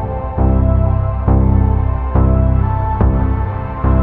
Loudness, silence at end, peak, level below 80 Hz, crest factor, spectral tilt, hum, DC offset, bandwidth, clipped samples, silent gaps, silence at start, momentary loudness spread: -15 LUFS; 0 s; -2 dBFS; -16 dBFS; 12 dB; -13 dB/octave; none; under 0.1%; 3 kHz; under 0.1%; none; 0 s; 5 LU